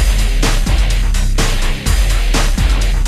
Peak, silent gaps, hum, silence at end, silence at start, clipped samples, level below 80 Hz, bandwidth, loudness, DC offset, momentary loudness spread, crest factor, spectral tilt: -2 dBFS; none; none; 0 s; 0 s; under 0.1%; -12 dBFS; 14 kHz; -16 LUFS; under 0.1%; 2 LU; 10 dB; -4 dB/octave